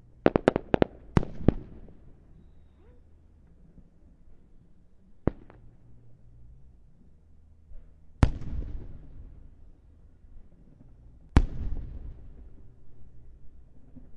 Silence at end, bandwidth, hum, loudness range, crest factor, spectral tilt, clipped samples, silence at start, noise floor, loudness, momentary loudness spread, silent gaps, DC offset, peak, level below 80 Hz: 0 s; 9.6 kHz; none; 10 LU; 32 dB; -8.5 dB/octave; under 0.1%; 0.25 s; -55 dBFS; -29 LUFS; 26 LU; none; under 0.1%; 0 dBFS; -38 dBFS